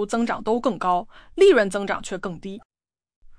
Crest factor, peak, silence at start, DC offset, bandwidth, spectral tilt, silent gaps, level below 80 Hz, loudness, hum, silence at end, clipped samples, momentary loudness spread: 18 dB; -6 dBFS; 0 s; under 0.1%; 10.5 kHz; -5 dB/octave; 2.65-2.70 s, 3.16-3.22 s; -50 dBFS; -22 LUFS; none; 0.05 s; under 0.1%; 20 LU